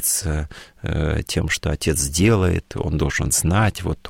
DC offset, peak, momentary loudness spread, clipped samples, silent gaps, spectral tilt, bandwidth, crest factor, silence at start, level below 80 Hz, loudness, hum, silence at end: under 0.1%; -4 dBFS; 10 LU; under 0.1%; none; -4.5 dB/octave; 16.5 kHz; 16 dB; 0 s; -30 dBFS; -20 LUFS; none; 0 s